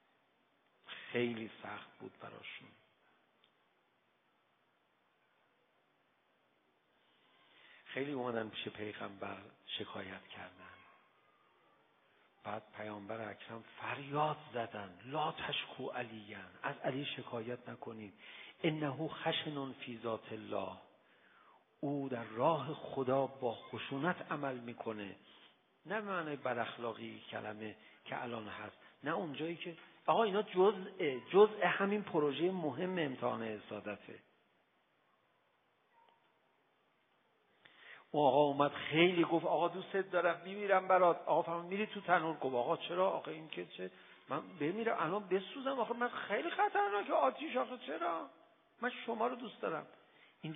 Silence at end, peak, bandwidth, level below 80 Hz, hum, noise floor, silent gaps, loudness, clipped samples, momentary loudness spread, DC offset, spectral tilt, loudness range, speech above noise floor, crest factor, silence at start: 0 s; -14 dBFS; 3.8 kHz; -86 dBFS; none; -76 dBFS; none; -37 LUFS; under 0.1%; 17 LU; under 0.1%; -2 dB/octave; 15 LU; 39 dB; 24 dB; 0.85 s